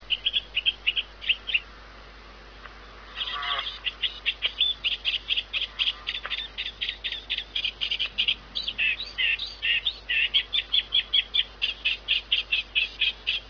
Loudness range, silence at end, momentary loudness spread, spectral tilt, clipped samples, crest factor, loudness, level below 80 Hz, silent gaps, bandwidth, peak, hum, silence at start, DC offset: 6 LU; 0 s; 9 LU; -1 dB/octave; under 0.1%; 20 dB; -25 LUFS; -50 dBFS; none; 5.4 kHz; -10 dBFS; none; 0 s; under 0.1%